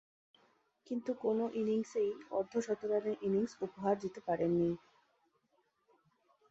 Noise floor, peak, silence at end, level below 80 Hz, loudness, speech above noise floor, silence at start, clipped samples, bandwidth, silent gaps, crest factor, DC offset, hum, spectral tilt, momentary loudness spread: -78 dBFS; -20 dBFS; 1.75 s; -74 dBFS; -36 LUFS; 42 dB; 0.9 s; under 0.1%; 8 kHz; none; 18 dB; under 0.1%; none; -7.5 dB/octave; 6 LU